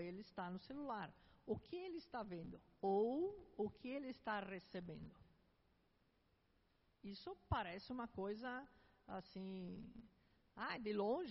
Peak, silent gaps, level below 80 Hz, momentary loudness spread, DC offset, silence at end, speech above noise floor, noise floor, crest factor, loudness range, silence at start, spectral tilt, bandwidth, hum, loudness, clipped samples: -28 dBFS; none; -68 dBFS; 14 LU; under 0.1%; 0 s; 32 dB; -79 dBFS; 20 dB; 7 LU; 0 s; -5 dB/octave; 5.8 kHz; none; -48 LUFS; under 0.1%